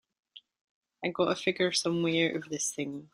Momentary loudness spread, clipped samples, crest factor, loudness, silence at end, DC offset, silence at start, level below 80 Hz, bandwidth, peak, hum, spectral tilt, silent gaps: 9 LU; under 0.1%; 18 dB; -30 LUFS; 0.1 s; under 0.1%; 0.35 s; -74 dBFS; 16 kHz; -14 dBFS; none; -3.5 dB/octave; 0.61-0.82 s